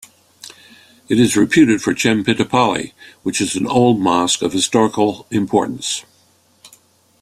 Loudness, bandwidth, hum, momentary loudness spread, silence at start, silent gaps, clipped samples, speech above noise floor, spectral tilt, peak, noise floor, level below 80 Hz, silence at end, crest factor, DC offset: -16 LUFS; 14.5 kHz; none; 12 LU; 0.45 s; none; under 0.1%; 40 dB; -4 dB/octave; -2 dBFS; -55 dBFS; -54 dBFS; 0.55 s; 16 dB; under 0.1%